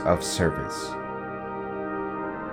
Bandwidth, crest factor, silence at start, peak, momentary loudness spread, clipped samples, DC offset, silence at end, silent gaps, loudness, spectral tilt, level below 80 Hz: over 20 kHz; 20 dB; 0 s; -8 dBFS; 9 LU; under 0.1%; under 0.1%; 0 s; none; -29 LUFS; -4.5 dB/octave; -50 dBFS